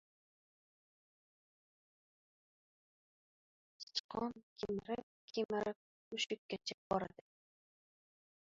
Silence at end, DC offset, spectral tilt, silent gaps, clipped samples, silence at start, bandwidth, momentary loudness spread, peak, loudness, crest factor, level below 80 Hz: 1.4 s; under 0.1%; -2.5 dB/octave; 3.83-3.87 s, 4.00-4.09 s, 4.43-4.56 s, 5.03-5.28 s, 5.45-5.49 s, 5.76-6.11 s, 6.38-6.49 s, 6.74-6.90 s; under 0.1%; 3.8 s; 7.4 kHz; 8 LU; -24 dBFS; -43 LUFS; 24 dB; -76 dBFS